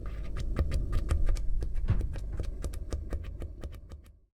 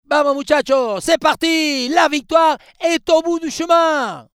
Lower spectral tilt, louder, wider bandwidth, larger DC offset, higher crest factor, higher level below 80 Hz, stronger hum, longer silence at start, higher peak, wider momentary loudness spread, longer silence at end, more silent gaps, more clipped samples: first, -7 dB/octave vs -2.5 dB/octave; second, -36 LUFS vs -16 LUFS; second, 12 kHz vs 15.5 kHz; neither; about the same, 18 dB vs 16 dB; first, -32 dBFS vs -52 dBFS; neither; about the same, 0 s vs 0.1 s; second, -14 dBFS vs -2 dBFS; first, 13 LU vs 5 LU; about the same, 0.25 s vs 0.15 s; neither; neither